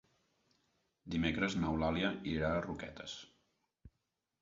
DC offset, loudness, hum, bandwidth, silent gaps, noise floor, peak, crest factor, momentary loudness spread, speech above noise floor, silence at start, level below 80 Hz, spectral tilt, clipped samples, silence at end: under 0.1%; -37 LUFS; none; 7.6 kHz; none; -86 dBFS; -18 dBFS; 20 dB; 12 LU; 50 dB; 1.05 s; -54 dBFS; -4.5 dB/octave; under 0.1%; 0.55 s